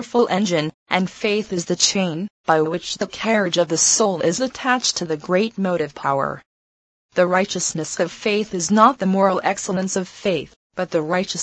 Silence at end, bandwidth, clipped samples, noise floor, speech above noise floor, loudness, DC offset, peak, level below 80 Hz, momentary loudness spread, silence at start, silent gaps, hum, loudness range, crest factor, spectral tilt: 0 s; 9.2 kHz; under 0.1%; under -90 dBFS; over 70 dB; -20 LUFS; under 0.1%; 0 dBFS; -60 dBFS; 9 LU; 0 s; 0.74-0.86 s, 2.30-2.44 s, 6.46-7.09 s, 10.56-10.70 s; none; 3 LU; 20 dB; -3.5 dB/octave